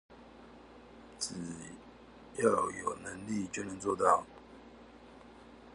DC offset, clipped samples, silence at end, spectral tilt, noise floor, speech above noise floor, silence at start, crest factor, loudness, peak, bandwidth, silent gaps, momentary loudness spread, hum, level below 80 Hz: under 0.1%; under 0.1%; 0 s; -4 dB/octave; -55 dBFS; 21 dB; 0.1 s; 26 dB; -34 LUFS; -12 dBFS; 11.5 kHz; none; 25 LU; none; -64 dBFS